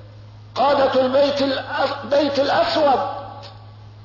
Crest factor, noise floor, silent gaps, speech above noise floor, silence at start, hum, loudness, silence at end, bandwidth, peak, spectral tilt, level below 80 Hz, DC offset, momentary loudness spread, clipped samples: 12 dB; -41 dBFS; none; 22 dB; 0 s; none; -19 LUFS; 0 s; 6 kHz; -8 dBFS; -5 dB/octave; -54 dBFS; under 0.1%; 16 LU; under 0.1%